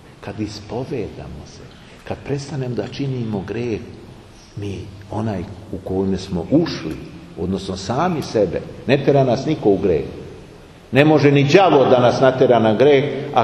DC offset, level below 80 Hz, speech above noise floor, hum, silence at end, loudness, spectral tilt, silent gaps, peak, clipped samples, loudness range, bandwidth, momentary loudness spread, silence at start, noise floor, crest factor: under 0.1%; -46 dBFS; 23 dB; none; 0 s; -18 LUFS; -7 dB/octave; none; 0 dBFS; under 0.1%; 12 LU; 12 kHz; 19 LU; 0.2 s; -41 dBFS; 18 dB